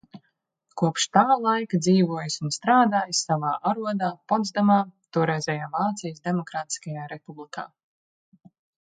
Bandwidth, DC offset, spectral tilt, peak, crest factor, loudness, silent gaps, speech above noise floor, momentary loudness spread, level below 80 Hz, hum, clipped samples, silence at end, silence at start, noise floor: 9.4 kHz; under 0.1%; -5 dB/octave; -2 dBFS; 22 dB; -24 LUFS; none; 50 dB; 17 LU; -72 dBFS; none; under 0.1%; 1.2 s; 0.15 s; -74 dBFS